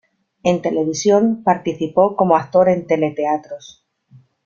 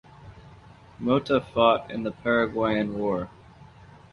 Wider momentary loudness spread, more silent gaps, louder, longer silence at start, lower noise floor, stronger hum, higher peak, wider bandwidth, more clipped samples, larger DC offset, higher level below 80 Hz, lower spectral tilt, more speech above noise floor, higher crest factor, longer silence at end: second, 7 LU vs 11 LU; neither; first, -17 LUFS vs -25 LUFS; first, 0.45 s vs 0.2 s; about the same, -50 dBFS vs -50 dBFS; neither; about the same, -2 dBFS vs -4 dBFS; second, 7.4 kHz vs 10.5 kHz; neither; neither; about the same, -58 dBFS vs -54 dBFS; second, -6 dB/octave vs -7.5 dB/octave; first, 34 dB vs 25 dB; second, 16 dB vs 22 dB; first, 0.9 s vs 0.45 s